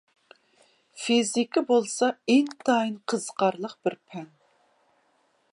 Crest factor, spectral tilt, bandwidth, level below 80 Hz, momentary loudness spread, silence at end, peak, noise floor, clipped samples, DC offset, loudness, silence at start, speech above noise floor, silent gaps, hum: 18 dB; -3.5 dB/octave; 11.5 kHz; -78 dBFS; 11 LU; 1.25 s; -10 dBFS; -68 dBFS; under 0.1%; under 0.1%; -25 LUFS; 0.95 s; 43 dB; none; none